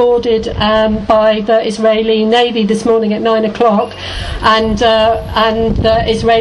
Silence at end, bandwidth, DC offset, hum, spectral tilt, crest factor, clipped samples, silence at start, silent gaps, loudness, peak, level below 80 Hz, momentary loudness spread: 0 s; 11.5 kHz; under 0.1%; none; -5.5 dB/octave; 12 dB; under 0.1%; 0 s; none; -12 LUFS; 0 dBFS; -28 dBFS; 3 LU